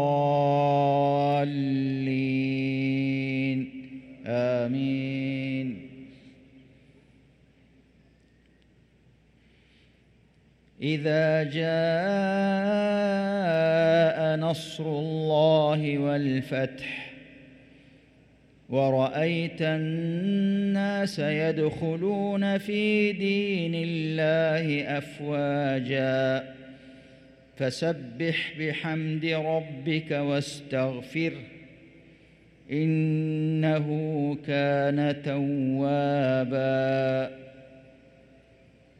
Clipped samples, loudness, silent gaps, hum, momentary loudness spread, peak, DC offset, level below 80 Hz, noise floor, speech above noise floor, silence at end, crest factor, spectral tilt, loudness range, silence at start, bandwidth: under 0.1%; -26 LUFS; none; none; 8 LU; -10 dBFS; under 0.1%; -66 dBFS; -61 dBFS; 35 dB; 1.2 s; 16 dB; -7.5 dB/octave; 6 LU; 0 s; 11.5 kHz